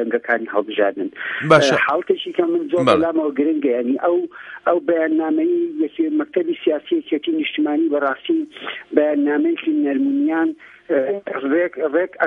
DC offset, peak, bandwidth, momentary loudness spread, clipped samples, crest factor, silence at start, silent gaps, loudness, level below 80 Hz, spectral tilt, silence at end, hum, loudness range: under 0.1%; 0 dBFS; 10.5 kHz; 7 LU; under 0.1%; 18 dB; 0 s; none; -19 LUFS; -64 dBFS; -5.5 dB/octave; 0 s; none; 3 LU